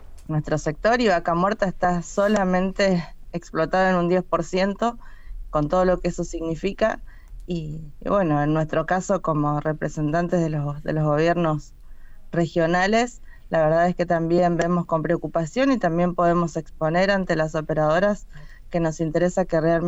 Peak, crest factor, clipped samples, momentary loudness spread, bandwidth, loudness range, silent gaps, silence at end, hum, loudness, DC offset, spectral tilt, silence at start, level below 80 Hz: -8 dBFS; 14 dB; under 0.1%; 8 LU; 8.2 kHz; 3 LU; none; 0 s; none; -22 LUFS; under 0.1%; -6.5 dB/octave; 0 s; -40 dBFS